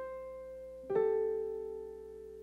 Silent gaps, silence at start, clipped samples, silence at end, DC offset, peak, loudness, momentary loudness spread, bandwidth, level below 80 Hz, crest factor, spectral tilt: none; 0 s; under 0.1%; 0 s; under 0.1%; -20 dBFS; -37 LUFS; 16 LU; 4 kHz; -64 dBFS; 18 dB; -7.5 dB/octave